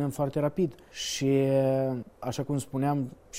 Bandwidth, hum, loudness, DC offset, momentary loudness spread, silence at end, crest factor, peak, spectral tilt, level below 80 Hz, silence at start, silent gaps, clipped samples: 16 kHz; none; -29 LUFS; under 0.1%; 10 LU; 0 s; 14 dB; -14 dBFS; -6 dB/octave; -58 dBFS; 0 s; none; under 0.1%